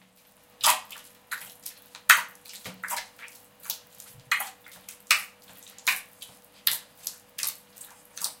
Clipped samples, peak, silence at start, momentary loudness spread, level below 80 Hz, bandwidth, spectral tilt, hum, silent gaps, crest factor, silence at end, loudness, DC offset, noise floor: under 0.1%; 0 dBFS; 0.6 s; 24 LU; -76 dBFS; 17 kHz; 2 dB/octave; 50 Hz at -70 dBFS; none; 32 dB; 0.05 s; -27 LUFS; under 0.1%; -59 dBFS